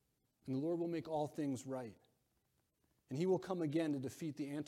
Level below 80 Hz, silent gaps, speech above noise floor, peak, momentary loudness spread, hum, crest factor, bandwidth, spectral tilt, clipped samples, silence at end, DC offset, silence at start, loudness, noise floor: -82 dBFS; none; 42 dB; -26 dBFS; 10 LU; none; 16 dB; 15 kHz; -7 dB/octave; under 0.1%; 0 s; under 0.1%; 0.45 s; -41 LUFS; -82 dBFS